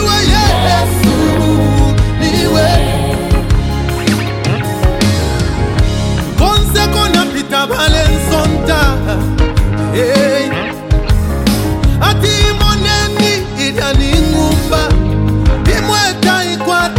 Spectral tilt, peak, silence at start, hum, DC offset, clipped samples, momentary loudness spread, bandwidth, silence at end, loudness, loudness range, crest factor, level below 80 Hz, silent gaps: -5 dB/octave; 0 dBFS; 0 s; none; under 0.1%; under 0.1%; 4 LU; 17 kHz; 0 s; -12 LUFS; 2 LU; 10 dB; -16 dBFS; none